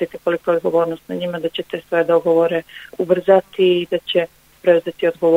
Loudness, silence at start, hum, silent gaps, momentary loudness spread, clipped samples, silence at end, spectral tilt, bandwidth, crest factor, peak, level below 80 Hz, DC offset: -18 LUFS; 0 s; none; none; 10 LU; under 0.1%; 0 s; -6.5 dB/octave; 16 kHz; 16 dB; 0 dBFS; -62 dBFS; under 0.1%